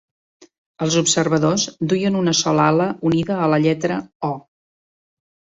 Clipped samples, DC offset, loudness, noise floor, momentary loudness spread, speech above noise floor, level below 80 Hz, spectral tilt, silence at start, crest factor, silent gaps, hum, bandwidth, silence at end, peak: under 0.1%; under 0.1%; -19 LUFS; under -90 dBFS; 10 LU; over 72 dB; -56 dBFS; -4.5 dB/octave; 0.8 s; 18 dB; 4.15-4.20 s; none; 8.2 kHz; 1.15 s; -2 dBFS